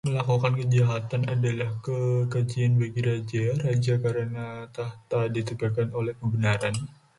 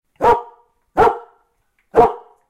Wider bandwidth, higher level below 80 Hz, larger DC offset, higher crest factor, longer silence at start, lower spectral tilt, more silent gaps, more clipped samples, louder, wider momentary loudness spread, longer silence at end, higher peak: second, 11.5 kHz vs 13 kHz; second, -58 dBFS vs -42 dBFS; neither; about the same, 16 dB vs 18 dB; second, 0.05 s vs 0.2 s; about the same, -7 dB/octave vs -6.5 dB/octave; neither; neither; second, -27 LUFS vs -16 LUFS; about the same, 7 LU vs 8 LU; about the same, 0.3 s vs 0.3 s; second, -10 dBFS vs 0 dBFS